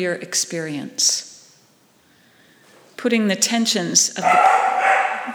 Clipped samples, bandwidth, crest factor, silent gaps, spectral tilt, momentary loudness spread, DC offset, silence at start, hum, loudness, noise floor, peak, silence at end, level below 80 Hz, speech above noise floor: under 0.1%; over 20 kHz; 20 dB; none; -2 dB/octave; 10 LU; under 0.1%; 0 s; none; -18 LUFS; -56 dBFS; 0 dBFS; 0 s; -78 dBFS; 37 dB